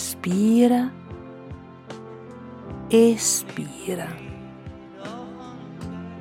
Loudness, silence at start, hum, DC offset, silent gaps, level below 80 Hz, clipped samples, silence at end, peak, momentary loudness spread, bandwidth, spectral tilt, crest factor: -21 LUFS; 0 s; none; under 0.1%; none; -54 dBFS; under 0.1%; 0 s; -6 dBFS; 23 LU; 16.5 kHz; -4.5 dB/octave; 20 dB